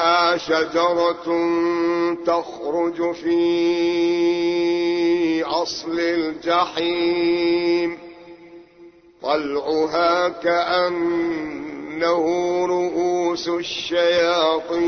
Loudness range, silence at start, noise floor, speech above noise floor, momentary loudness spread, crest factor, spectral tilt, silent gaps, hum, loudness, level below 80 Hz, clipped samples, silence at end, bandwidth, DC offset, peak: 2 LU; 0 s; -47 dBFS; 27 dB; 6 LU; 14 dB; -4.5 dB/octave; none; none; -20 LUFS; -58 dBFS; under 0.1%; 0 s; 6.6 kHz; under 0.1%; -6 dBFS